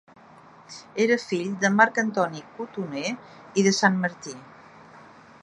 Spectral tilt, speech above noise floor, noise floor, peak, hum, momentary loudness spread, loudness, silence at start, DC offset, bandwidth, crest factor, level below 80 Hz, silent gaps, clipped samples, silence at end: -4.5 dB/octave; 26 dB; -50 dBFS; -2 dBFS; none; 19 LU; -24 LUFS; 0.7 s; under 0.1%; 11 kHz; 24 dB; -72 dBFS; none; under 0.1%; 0.45 s